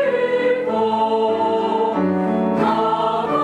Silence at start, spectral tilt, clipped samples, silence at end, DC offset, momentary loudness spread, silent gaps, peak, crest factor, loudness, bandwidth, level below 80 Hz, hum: 0 s; -7.5 dB/octave; under 0.1%; 0 s; under 0.1%; 1 LU; none; -6 dBFS; 12 dB; -19 LUFS; 10 kHz; -60 dBFS; none